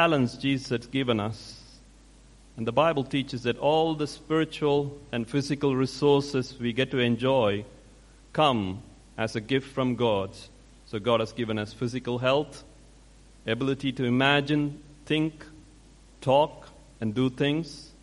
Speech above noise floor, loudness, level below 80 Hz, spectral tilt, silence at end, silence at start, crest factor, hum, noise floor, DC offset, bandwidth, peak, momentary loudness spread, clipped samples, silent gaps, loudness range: 27 dB; -27 LUFS; -54 dBFS; -6 dB/octave; 0.15 s; 0 s; 20 dB; none; -53 dBFS; under 0.1%; 11.5 kHz; -6 dBFS; 11 LU; under 0.1%; none; 3 LU